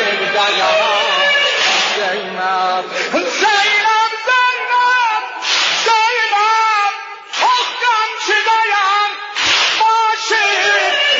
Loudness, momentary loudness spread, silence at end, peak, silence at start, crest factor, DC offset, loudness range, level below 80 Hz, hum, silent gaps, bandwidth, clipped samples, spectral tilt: -13 LUFS; 6 LU; 0 s; -2 dBFS; 0 s; 12 dB; under 0.1%; 1 LU; -64 dBFS; none; none; 7.8 kHz; under 0.1%; 0 dB/octave